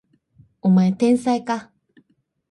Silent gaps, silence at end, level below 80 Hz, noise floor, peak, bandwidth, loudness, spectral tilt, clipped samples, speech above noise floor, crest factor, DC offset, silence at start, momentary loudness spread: none; 0.85 s; -64 dBFS; -66 dBFS; -8 dBFS; 11.5 kHz; -20 LUFS; -7.5 dB/octave; under 0.1%; 48 dB; 14 dB; under 0.1%; 0.65 s; 10 LU